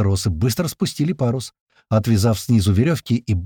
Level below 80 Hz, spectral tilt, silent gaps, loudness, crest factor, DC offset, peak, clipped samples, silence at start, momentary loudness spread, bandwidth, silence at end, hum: -40 dBFS; -6.5 dB/octave; 1.60-1.67 s; -20 LUFS; 12 dB; under 0.1%; -6 dBFS; under 0.1%; 0 s; 6 LU; 18.5 kHz; 0 s; none